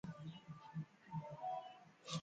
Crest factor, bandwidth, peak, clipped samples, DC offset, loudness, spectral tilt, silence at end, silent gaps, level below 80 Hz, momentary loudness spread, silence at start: 20 dB; 9 kHz; -30 dBFS; under 0.1%; under 0.1%; -51 LUFS; -5.5 dB/octave; 0 s; none; -80 dBFS; 9 LU; 0.05 s